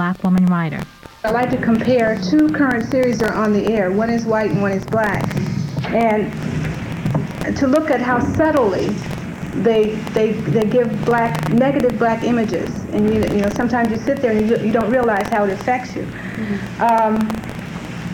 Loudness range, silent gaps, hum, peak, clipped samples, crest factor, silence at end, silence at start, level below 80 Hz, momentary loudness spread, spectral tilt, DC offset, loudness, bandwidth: 2 LU; none; none; -4 dBFS; under 0.1%; 12 dB; 0 s; 0 s; -42 dBFS; 9 LU; -7 dB/octave; under 0.1%; -18 LUFS; 18 kHz